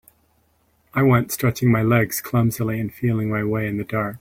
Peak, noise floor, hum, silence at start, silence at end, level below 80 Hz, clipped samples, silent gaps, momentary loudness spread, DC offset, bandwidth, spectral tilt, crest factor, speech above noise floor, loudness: -4 dBFS; -63 dBFS; none; 0.95 s; 0.05 s; -50 dBFS; under 0.1%; none; 7 LU; under 0.1%; 16.5 kHz; -6.5 dB/octave; 18 dB; 43 dB; -21 LUFS